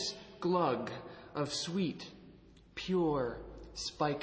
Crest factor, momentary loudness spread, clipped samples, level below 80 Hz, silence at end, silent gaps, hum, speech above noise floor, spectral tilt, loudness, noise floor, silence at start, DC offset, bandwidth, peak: 18 dB; 15 LU; under 0.1%; -60 dBFS; 0 s; none; none; 24 dB; -5 dB/octave; -36 LUFS; -58 dBFS; 0 s; under 0.1%; 8 kHz; -18 dBFS